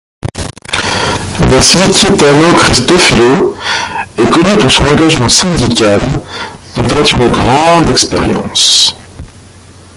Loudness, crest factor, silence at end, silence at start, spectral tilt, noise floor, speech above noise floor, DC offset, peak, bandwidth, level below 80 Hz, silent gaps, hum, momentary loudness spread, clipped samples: -7 LUFS; 8 dB; 0.7 s; 0.25 s; -3.5 dB/octave; -35 dBFS; 27 dB; under 0.1%; 0 dBFS; 16 kHz; -26 dBFS; none; none; 12 LU; 0.2%